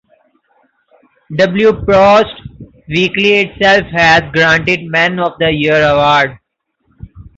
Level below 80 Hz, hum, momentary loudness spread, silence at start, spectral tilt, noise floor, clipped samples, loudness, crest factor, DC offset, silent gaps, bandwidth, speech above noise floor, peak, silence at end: -38 dBFS; none; 6 LU; 1.3 s; -5 dB/octave; -64 dBFS; under 0.1%; -10 LUFS; 12 dB; under 0.1%; none; 7.8 kHz; 54 dB; 0 dBFS; 0.15 s